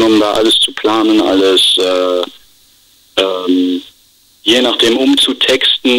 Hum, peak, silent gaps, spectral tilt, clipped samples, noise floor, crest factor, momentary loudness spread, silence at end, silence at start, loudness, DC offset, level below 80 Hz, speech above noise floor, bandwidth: none; 0 dBFS; none; -2.5 dB/octave; under 0.1%; -49 dBFS; 12 dB; 9 LU; 0 s; 0 s; -11 LUFS; under 0.1%; -50 dBFS; 38 dB; 16 kHz